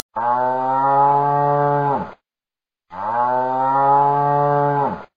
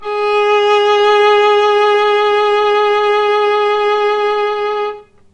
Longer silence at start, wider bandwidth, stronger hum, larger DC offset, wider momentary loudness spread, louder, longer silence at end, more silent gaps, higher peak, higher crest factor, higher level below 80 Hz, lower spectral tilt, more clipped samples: first, 0.15 s vs 0 s; second, 5.2 kHz vs 8.4 kHz; neither; first, 0.3% vs under 0.1%; first, 9 LU vs 6 LU; second, -18 LUFS vs -12 LUFS; second, 0.1 s vs 0.3 s; neither; about the same, -4 dBFS vs -2 dBFS; about the same, 14 dB vs 10 dB; second, -64 dBFS vs -54 dBFS; first, -9.5 dB/octave vs -2 dB/octave; neither